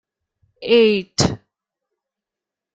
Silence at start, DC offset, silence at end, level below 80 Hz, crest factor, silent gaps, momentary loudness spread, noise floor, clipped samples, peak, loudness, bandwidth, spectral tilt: 0.6 s; under 0.1%; 1.4 s; -50 dBFS; 20 dB; none; 18 LU; -87 dBFS; under 0.1%; -2 dBFS; -17 LUFS; 9.2 kHz; -4.5 dB/octave